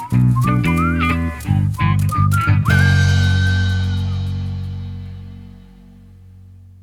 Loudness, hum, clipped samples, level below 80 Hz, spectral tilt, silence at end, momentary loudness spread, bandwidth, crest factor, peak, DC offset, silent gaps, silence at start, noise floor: -17 LUFS; none; under 0.1%; -32 dBFS; -6.5 dB/octave; 0.3 s; 15 LU; 15 kHz; 14 dB; -2 dBFS; under 0.1%; none; 0 s; -42 dBFS